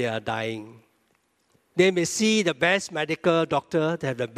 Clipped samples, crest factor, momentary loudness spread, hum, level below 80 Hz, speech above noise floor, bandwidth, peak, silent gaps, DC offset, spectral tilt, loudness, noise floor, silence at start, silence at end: under 0.1%; 20 dB; 8 LU; none; -66 dBFS; 44 dB; 15 kHz; -6 dBFS; none; under 0.1%; -4 dB/octave; -24 LUFS; -68 dBFS; 0 s; 0 s